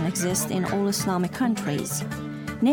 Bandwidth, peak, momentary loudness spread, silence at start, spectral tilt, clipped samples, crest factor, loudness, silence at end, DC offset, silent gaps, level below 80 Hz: over 20 kHz; -10 dBFS; 7 LU; 0 s; -4.5 dB/octave; under 0.1%; 14 dB; -26 LUFS; 0 s; under 0.1%; none; -54 dBFS